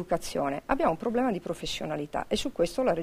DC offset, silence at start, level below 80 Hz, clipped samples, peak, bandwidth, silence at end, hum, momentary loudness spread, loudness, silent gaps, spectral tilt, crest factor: under 0.1%; 0 s; -48 dBFS; under 0.1%; -10 dBFS; 15.5 kHz; 0 s; none; 6 LU; -29 LUFS; none; -5 dB/octave; 20 dB